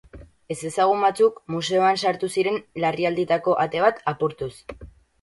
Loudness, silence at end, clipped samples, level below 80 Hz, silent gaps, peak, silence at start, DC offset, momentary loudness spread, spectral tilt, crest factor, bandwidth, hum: -22 LUFS; 0.35 s; under 0.1%; -54 dBFS; none; -4 dBFS; 0.15 s; under 0.1%; 13 LU; -5 dB/octave; 18 dB; 11.5 kHz; none